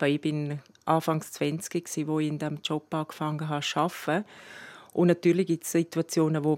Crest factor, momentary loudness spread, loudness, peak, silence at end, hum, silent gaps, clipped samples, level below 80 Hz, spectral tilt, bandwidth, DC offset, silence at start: 20 dB; 10 LU; -28 LUFS; -8 dBFS; 0 s; none; none; under 0.1%; -80 dBFS; -5.5 dB/octave; 16.5 kHz; under 0.1%; 0 s